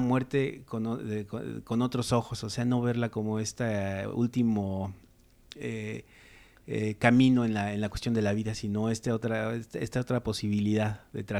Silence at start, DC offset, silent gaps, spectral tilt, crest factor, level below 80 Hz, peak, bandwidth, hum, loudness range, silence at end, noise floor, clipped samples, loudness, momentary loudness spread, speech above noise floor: 0 s; under 0.1%; none; -6.5 dB/octave; 22 dB; -54 dBFS; -8 dBFS; 13.5 kHz; none; 5 LU; 0 s; -55 dBFS; under 0.1%; -30 LUFS; 10 LU; 26 dB